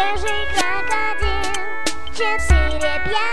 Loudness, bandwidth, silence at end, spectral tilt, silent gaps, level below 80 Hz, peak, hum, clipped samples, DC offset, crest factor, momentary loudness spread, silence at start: -20 LUFS; 11 kHz; 0 s; -3.5 dB/octave; none; -26 dBFS; -2 dBFS; none; under 0.1%; 10%; 18 dB; 7 LU; 0 s